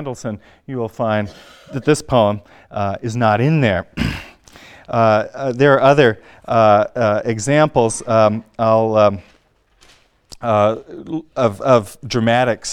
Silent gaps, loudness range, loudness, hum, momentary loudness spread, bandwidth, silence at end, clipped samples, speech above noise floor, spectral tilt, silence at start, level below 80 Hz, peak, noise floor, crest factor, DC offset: none; 5 LU; -16 LUFS; none; 15 LU; 13.5 kHz; 0 s; under 0.1%; 40 dB; -6 dB/octave; 0 s; -44 dBFS; 0 dBFS; -56 dBFS; 16 dB; under 0.1%